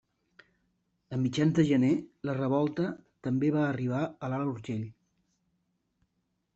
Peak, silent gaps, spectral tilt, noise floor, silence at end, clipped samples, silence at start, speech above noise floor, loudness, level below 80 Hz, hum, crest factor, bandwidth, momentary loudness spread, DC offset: -12 dBFS; none; -7.5 dB/octave; -79 dBFS; 1.65 s; under 0.1%; 1.1 s; 50 dB; -30 LUFS; -68 dBFS; none; 18 dB; 8 kHz; 12 LU; under 0.1%